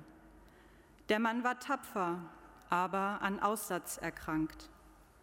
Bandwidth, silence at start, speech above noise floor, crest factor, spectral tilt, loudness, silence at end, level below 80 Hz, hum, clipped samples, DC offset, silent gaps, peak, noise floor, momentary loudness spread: 16.5 kHz; 0 s; 25 dB; 22 dB; -4.5 dB/octave; -36 LUFS; 0.2 s; -64 dBFS; none; under 0.1%; under 0.1%; none; -16 dBFS; -61 dBFS; 20 LU